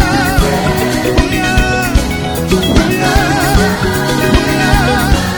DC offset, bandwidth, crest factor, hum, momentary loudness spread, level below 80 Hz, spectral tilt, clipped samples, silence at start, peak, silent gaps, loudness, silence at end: under 0.1%; 19.5 kHz; 12 dB; none; 3 LU; -18 dBFS; -5 dB/octave; under 0.1%; 0 s; 0 dBFS; none; -12 LUFS; 0 s